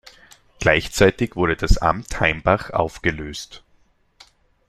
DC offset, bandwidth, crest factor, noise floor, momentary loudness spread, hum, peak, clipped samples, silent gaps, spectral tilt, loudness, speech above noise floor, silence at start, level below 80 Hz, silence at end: under 0.1%; 14.5 kHz; 20 dB; -59 dBFS; 13 LU; none; -2 dBFS; under 0.1%; none; -5 dB/octave; -20 LUFS; 40 dB; 0.6 s; -30 dBFS; 1.1 s